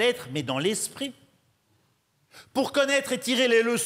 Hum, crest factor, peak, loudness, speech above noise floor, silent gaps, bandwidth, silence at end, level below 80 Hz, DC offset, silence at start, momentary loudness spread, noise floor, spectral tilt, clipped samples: none; 16 dB; -10 dBFS; -25 LUFS; 43 dB; none; 16 kHz; 0 s; -72 dBFS; under 0.1%; 0 s; 11 LU; -69 dBFS; -3 dB/octave; under 0.1%